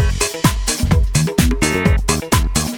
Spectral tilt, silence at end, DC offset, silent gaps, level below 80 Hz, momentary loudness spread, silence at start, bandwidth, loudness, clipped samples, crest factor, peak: -4.5 dB/octave; 0 s; under 0.1%; none; -20 dBFS; 2 LU; 0 s; 19.5 kHz; -16 LUFS; under 0.1%; 16 dB; 0 dBFS